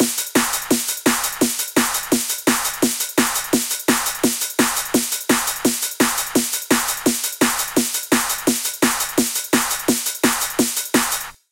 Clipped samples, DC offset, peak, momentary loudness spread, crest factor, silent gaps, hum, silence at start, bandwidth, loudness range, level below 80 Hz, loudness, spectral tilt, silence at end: under 0.1%; under 0.1%; -2 dBFS; 2 LU; 18 dB; none; none; 0 s; 17 kHz; 0 LU; -50 dBFS; -18 LUFS; -1.5 dB/octave; 0.2 s